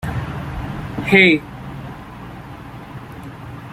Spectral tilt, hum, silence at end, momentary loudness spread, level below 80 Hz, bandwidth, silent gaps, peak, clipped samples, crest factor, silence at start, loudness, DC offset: -6.5 dB/octave; none; 0 s; 23 LU; -40 dBFS; 15.5 kHz; none; -2 dBFS; under 0.1%; 20 dB; 0 s; -16 LUFS; under 0.1%